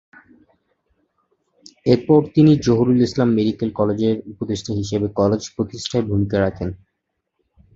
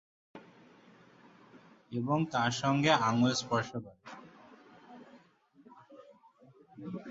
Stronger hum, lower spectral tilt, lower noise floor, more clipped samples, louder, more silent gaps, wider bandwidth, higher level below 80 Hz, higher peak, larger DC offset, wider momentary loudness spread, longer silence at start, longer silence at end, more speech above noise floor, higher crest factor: neither; first, -7 dB/octave vs -5 dB/octave; first, -76 dBFS vs -63 dBFS; neither; first, -19 LUFS vs -31 LUFS; neither; about the same, 7.8 kHz vs 8 kHz; first, -46 dBFS vs -72 dBFS; first, -2 dBFS vs -12 dBFS; neither; second, 12 LU vs 27 LU; first, 1.85 s vs 0.35 s; first, 1 s vs 0 s; first, 58 dB vs 33 dB; second, 18 dB vs 24 dB